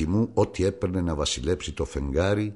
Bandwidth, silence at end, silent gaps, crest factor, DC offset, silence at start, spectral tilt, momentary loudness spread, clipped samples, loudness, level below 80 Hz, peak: 11.5 kHz; 0 s; none; 16 dB; 0.1%; 0 s; -5.5 dB/octave; 5 LU; under 0.1%; -26 LUFS; -36 dBFS; -10 dBFS